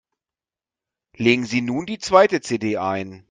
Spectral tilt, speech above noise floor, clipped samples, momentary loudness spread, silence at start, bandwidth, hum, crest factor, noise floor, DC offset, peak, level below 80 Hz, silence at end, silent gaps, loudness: -5 dB/octave; over 70 dB; under 0.1%; 10 LU; 1.2 s; 9.6 kHz; none; 22 dB; under -90 dBFS; under 0.1%; 0 dBFS; -60 dBFS; 0.1 s; none; -20 LUFS